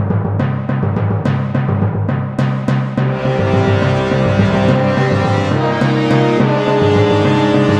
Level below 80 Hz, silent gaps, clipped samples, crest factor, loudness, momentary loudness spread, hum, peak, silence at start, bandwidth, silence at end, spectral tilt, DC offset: -40 dBFS; none; under 0.1%; 14 dB; -14 LUFS; 5 LU; none; 0 dBFS; 0 s; 8.8 kHz; 0 s; -8 dB/octave; under 0.1%